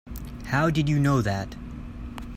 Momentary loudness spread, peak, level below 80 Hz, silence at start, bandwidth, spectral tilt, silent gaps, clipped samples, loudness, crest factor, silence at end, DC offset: 17 LU; -10 dBFS; -40 dBFS; 0.05 s; 16 kHz; -7 dB/octave; none; under 0.1%; -24 LUFS; 16 dB; 0 s; under 0.1%